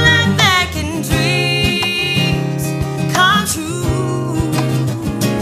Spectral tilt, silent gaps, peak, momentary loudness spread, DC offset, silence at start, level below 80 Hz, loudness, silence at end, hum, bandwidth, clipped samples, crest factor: -4 dB/octave; none; 0 dBFS; 8 LU; under 0.1%; 0 s; -32 dBFS; -15 LUFS; 0 s; none; 15.5 kHz; under 0.1%; 16 dB